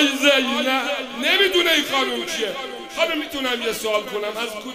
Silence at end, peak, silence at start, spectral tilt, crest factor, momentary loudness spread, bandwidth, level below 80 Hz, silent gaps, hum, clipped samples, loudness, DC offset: 0 s; -2 dBFS; 0 s; -1 dB/octave; 20 dB; 11 LU; 16 kHz; -58 dBFS; none; none; under 0.1%; -20 LUFS; under 0.1%